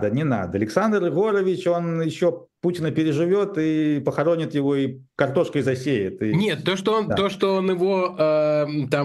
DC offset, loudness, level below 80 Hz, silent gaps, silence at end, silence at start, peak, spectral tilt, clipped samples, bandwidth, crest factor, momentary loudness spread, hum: under 0.1%; -22 LUFS; -60 dBFS; none; 0 s; 0 s; -4 dBFS; -7 dB/octave; under 0.1%; 12.5 kHz; 18 dB; 3 LU; none